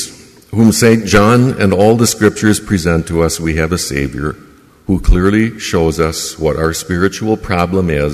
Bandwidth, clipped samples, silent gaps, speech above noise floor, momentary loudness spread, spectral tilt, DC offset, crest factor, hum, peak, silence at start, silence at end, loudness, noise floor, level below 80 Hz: 15.5 kHz; under 0.1%; none; 21 dB; 9 LU; -5.5 dB/octave; under 0.1%; 12 dB; none; 0 dBFS; 0 s; 0 s; -13 LUFS; -33 dBFS; -24 dBFS